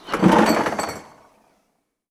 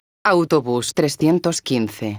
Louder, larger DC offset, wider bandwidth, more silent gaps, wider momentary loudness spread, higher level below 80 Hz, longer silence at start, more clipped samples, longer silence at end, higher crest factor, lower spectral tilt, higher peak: about the same, -19 LUFS vs -19 LUFS; neither; second, 15 kHz vs over 20 kHz; neither; first, 16 LU vs 5 LU; first, -50 dBFS vs -58 dBFS; second, 0.05 s vs 0.25 s; neither; first, 1.05 s vs 0 s; about the same, 20 dB vs 16 dB; about the same, -5.5 dB/octave vs -5 dB/octave; about the same, 0 dBFS vs -2 dBFS